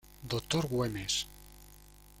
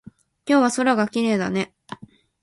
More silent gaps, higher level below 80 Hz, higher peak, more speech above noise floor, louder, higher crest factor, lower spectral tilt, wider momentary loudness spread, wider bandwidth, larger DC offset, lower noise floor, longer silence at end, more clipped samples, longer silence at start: neither; first, -54 dBFS vs -62 dBFS; second, -16 dBFS vs -4 dBFS; about the same, 23 dB vs 21 dB; second, -34 LUFS vs -21 LUFS; about the same, 20 dB vs 18 dB; about the same, -4 dB/octave vs -5 dB/octave; about the same, 22 LU vs 21 LU; first, 16.5 kHz vs 11.5 kHz; neither; first, -56 dBFS vs -41 dBFS; second, 0 s vs 0.45 s; neither; second, 0.05 s vs 0.45 s